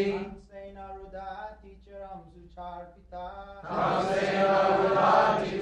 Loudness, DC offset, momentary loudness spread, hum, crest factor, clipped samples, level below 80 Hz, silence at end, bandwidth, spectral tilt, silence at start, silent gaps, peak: -25 LUFS; under 0.1%; 23 LU; none; 18 dB; under 0.1%; -54 dBFS; 0 s; 10 kHz; -6 dB/octave; 0 s; none; -10 dBFS